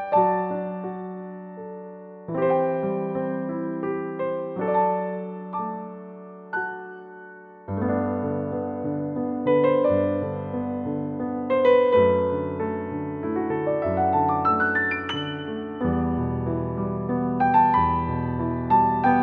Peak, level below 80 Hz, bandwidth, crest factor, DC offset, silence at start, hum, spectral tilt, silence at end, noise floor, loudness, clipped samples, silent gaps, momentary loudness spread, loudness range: -8 dBFS; -48 dBFS; 5 kHz; 16 dB; under 0.1%; 0 s; none; -9 dB/octave; 0 s; -44 dBFS; -24 LUFS; under 0.1%; none; 17 LU; 7 LU